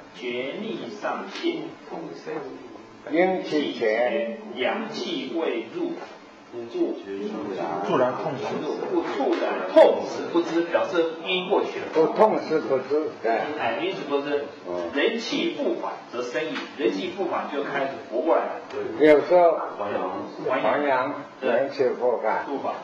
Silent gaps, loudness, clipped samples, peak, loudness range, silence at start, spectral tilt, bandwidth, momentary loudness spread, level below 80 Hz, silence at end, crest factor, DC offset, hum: none; -25 LUFS; under 0.1%; -4 dBFS; 6 LU; 0 s; -5.5 dB/octave; 7.8 kHz; 12 LU; -70 dBFS; 0 s; 20 dB; under 0.1%; none